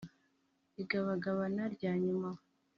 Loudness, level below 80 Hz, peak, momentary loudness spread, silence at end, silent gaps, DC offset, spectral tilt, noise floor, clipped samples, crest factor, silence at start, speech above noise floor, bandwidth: -37 LUFS; -76 dBFS; -22 dBFS; 17 LU; 0.4 s; none; under 0.1%; -6.5 dB/octave; -77 dBFS; under 0.1%; 16 dB; 0 s; 41 dB; 6.4 kHz